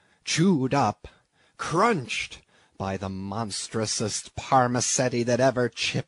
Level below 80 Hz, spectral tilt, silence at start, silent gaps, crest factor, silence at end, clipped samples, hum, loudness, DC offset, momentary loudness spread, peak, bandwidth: -58 dBFS; -4 dB/octave; 0.25 s; none; 18 dB; 0.05 s; under 0.1%; none; -25 LUFS; under 0.1%; 10 LU; -8 dBFS; 11 kHz